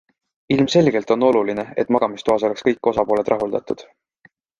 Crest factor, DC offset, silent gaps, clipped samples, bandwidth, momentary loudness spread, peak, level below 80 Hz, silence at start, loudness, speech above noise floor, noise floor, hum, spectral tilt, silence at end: 18 dB; under 0.1%; none; under 0.1%; 9.6 kHz; 8 LU; -2 dBFS; -56 dBFS; 0.5 s; -19 LUFS; 38 dB; -56 dBFS; none; -6 dB/octave; 0.75 s